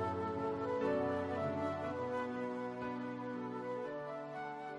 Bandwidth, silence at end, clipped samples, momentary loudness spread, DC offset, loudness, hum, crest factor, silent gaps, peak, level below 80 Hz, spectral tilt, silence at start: 11 kHz; 0 s; under 0.1%; 8 LU; under 0.1%; -40 LUFS; none; 14 dB; none; -24 dBFS; -74 dBFS; -7.5 dB/octave; 0 s